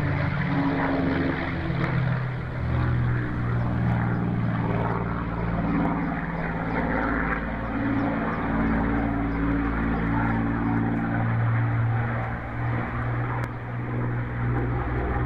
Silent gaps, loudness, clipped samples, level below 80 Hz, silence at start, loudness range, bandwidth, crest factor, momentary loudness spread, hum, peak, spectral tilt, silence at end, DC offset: none; -26 LUFS; under 0.1%; -36 dBFS; 0 s; 2 LU; 5.2 kHz; 12 dB; 4 LU; none; -12 dBFS; -9.5 dB/octave; 0 s; under 0.1%